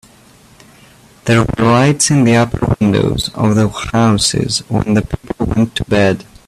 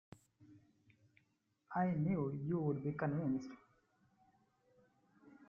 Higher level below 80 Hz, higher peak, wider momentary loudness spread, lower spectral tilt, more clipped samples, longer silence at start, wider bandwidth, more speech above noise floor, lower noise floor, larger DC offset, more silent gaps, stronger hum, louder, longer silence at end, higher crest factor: first, -34 dBFS vs -74 dBFS; first, 0 dBFS vs -26 dBFS; about the same, 6 LU vs 7 LU; second, -5 dB/octave vs -10 dB/octave; neither; first, 1.25 s vs 0.4 s; first, 13.5 kHz vs 7 kHz; second, 32 dB vs 42 dB; second, -44 dBFS vs -80 dBFS; neither; neither; neither; first, -13 LUFS vs -39 LUFS; first, 0.25 s vs 0.05 s; about the same, 14 dB vs 16 dB